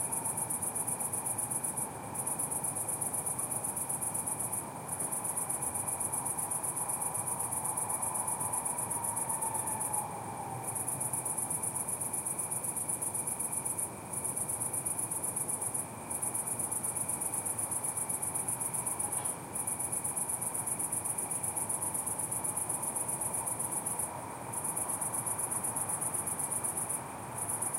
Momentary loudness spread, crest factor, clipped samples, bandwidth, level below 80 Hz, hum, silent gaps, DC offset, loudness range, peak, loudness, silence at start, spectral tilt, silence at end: 3 LU; 16 dB; under 0.1%; 16 kHz; -66 dBFS; none; none; under 0.1%; 1 LU; -18 dBFS; -33 LUFS; 0 s; -3 dB/octave; 0 s